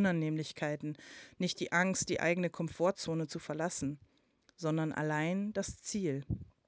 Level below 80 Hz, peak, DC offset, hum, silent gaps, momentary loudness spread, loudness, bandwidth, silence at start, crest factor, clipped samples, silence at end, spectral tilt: -60 dBFS; -16 dBFS; under 0.1%; none; none; 9 LU; -35 LUFS; 8 kHz; 0 s; 20 dB; under 0.1%; 0.25 s; -5 dB/octave